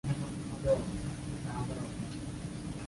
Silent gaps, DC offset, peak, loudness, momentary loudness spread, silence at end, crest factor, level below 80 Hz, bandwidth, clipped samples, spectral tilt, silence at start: none; under 0.1%; -18 dBFS; -37 LUFS; 9 LU; 0 s; 18 dB; -48 dBFS; 11.5 kHz; under 0.1%; -6.5 dB/octave; 0.05 s